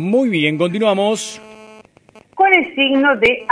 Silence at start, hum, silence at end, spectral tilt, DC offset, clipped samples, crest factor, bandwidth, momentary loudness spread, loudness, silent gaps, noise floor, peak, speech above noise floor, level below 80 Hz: 0 s; none; 0.05 s; -4.5 dB/octave; under 0.1%; under 0.1%; 16 dB; 11 kHz; 9 LU; -15 LUFS; none; -48 dBFS; 0 dBFS; 32 dB; -54 dBFS